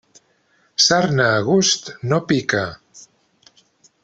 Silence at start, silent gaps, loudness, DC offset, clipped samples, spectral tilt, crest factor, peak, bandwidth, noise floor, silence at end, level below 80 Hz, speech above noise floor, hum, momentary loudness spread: 0.8 s; none; -17 LUFS; under 0.1%; under 0.1%; -3.5 dB/octave; 18 dB; -2 dBFS; 8.4 kHz; -61 dBFS; 1.05 s; -58 dBFS; 43 dB; none; 8 LU